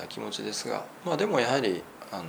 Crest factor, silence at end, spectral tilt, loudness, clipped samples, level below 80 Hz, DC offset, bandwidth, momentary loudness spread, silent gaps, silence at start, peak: 22 dB; 0 s; -4 dB/octave; -29 LUFS; under 0.1%; -72 dBFS; under 0.1%; over 20 kHz; 10 LU; none; 0 s; -8 dBFS